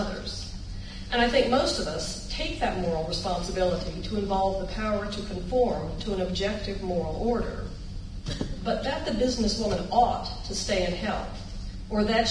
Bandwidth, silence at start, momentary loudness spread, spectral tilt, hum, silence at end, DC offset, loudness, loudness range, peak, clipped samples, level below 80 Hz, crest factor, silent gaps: 11 kHz; 0 s; 14 LU; -4.5 dB/octave; none; 0 s; under 0.1%; -28 LUFS; 3 LU; -10 dBFS; under 0.1%; -38 dBFS; 18 dB; none